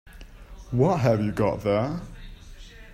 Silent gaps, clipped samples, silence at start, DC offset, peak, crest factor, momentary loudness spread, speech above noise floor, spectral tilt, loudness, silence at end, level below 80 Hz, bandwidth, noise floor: none; under 0.1%; 0.05 s; under 0.1%; -8 dBFS; 18 dB; 17 LU; 21 dB; -8 dB/octave; -24 LUFS; 0 s; -44 dBFS; 14.5 kHz; -44 dBFS